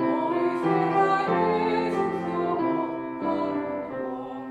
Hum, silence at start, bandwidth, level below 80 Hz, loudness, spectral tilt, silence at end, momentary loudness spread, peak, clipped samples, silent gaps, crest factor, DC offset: none; 0 s; 9.4 kHz; -64 dBFS; -26 LUFS; -7.5 dB/octave; 0 s; 9 LU; -8 dBFS; under 0.1%; none; 16 dB; under 0.1%